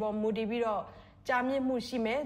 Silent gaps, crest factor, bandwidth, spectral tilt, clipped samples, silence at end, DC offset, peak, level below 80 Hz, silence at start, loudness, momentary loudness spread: none; 12 dB; 15.5 kHz; -5.5 dB/octave; under 0.1%; 0 s; under 0.1%; -20 dBFS; -62 dBFS; 0 s; -32 LUFS; 8 LU